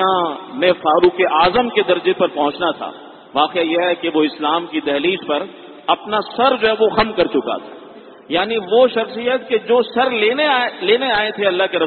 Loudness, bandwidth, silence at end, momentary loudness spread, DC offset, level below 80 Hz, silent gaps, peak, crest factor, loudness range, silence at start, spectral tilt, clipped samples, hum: -17 LUFS; 4.5 kHz; 0 s; 8 LU; under 0.1%; -52 dBFS; none; 0 dBFS; 16 dB; 2 LU; 0 s; -9 dB/octave; under 0.1%; none